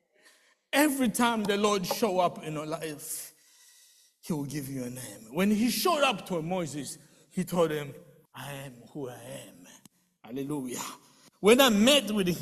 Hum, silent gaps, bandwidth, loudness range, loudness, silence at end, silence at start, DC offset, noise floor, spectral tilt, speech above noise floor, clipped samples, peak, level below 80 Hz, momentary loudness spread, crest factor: none; none; 14.5 kHz; 9 LU; -28 LUFS; 0 s; 0.75 s; under 0.1%; -63 dBFS; -4 dB/octave; 34 dB; under 0.1%; -6 dBFS; -64 dBFS; 19 LU; 24 dB